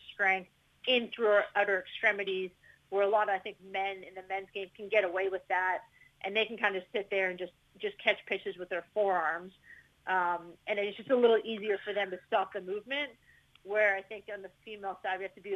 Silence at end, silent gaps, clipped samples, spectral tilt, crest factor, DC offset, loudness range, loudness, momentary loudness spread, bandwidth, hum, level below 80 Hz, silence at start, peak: 0 s; none; under 0.1%; -5 dB/octave; 22 dB; under 0.1%; 3 LU; -32 LUFS; 13 LU; 10.5 kHz; none; -76 dBFS; 0.05 s; -10 dBFS